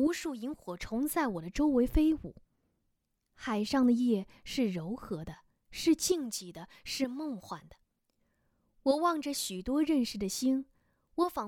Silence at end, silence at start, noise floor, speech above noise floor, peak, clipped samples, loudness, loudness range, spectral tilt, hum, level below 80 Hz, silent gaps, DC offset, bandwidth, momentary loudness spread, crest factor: 0 s; 0 s; -80 dBFS; 48 dB; -14 dBFS; under 0.1%; -32 LUFS; 4 LU; -4.5 dB/octave; none; -48 dBFS; none; under 0.1%; 18 kHz; 15 LU; 18 dB